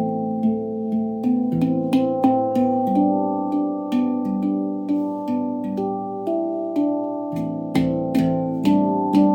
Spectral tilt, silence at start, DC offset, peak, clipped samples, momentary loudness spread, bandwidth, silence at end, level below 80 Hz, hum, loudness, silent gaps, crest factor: -9 dB/octave; 0 s; under 0.1%; -4 dBFS; under 0.1%; 6 LU; 16.5 kHz; 0 s; -54 dBFS; none; -22 LUFS; none; 16 dB